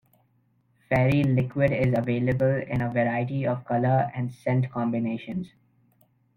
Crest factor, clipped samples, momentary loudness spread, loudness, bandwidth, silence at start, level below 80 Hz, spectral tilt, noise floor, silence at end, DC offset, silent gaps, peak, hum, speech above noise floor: 18 dB; under 0.1%; 8 LU; -25 LUFS; 5.6 kHz; 0.9 s; -54 dBFS; -9.5 dB/octave; -67 dBFS; 0.9 s; under 0.1%; none; -8 dBFS; none; 42 dB